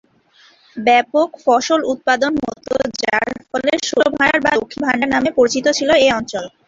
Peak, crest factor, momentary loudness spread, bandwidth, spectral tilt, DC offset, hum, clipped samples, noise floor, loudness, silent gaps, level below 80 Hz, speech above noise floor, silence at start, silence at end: -2 dBFS; 14 dB; 7 LU; 7.8 kHz; -3 dB/octave; under 0.1%; none; under 0.1%; -51 dBFS; -16 LUFS; none; -50 dBFS; 35 dB; 0.75 s; 0.2 s